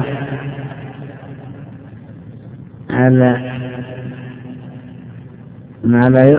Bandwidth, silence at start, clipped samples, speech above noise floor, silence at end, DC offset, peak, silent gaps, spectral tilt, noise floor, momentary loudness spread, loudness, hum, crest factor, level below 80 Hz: 4 kHz; 0 s; 0.1%; 26 dB; 0 s; under 0.1%; 0 dBFS; none; -12.5 dB/octave; -36 dBFS; 24 LU; -16 LUFS; none; 18 dB; -48 dBFS